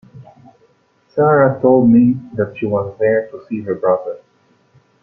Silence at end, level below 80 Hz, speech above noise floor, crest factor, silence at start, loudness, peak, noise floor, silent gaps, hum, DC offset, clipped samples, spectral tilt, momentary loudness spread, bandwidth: 0.85 s; -56 dBFS; 42 dB; 14 dB; 0.15 s; -15 LUFS; -2 dBFS; -56 dBFS; none; none; under 0.1%; under 0.1%; -11.5 dB/octave; 15 LU; 3.2 kHz